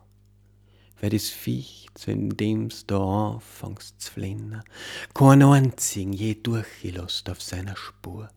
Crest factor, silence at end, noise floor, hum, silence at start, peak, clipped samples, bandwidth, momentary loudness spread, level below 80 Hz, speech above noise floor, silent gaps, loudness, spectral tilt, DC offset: 22 dB; 0.1 s; -57 dBFS; 50 Hz at -50 dBFS; 1 s; -2 dBFS; under 0.1%; 17 kHz; 21 LU; -58 dBFS; 33 dB; none; -24 LUFS; -6 dB/octave; under 0.1%